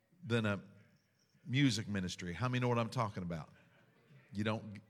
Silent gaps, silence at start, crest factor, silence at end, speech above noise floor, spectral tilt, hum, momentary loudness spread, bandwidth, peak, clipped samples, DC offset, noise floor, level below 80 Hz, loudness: none; 0.2 s; 18 dB; 0.1 s; 36 dB; -5.5 dB/octave; none; 13 LU; 13 kHz; -20 dBFS; under 0.1%; under 0.1%; -73 dBFS; -70 dBFS; -37 LUFS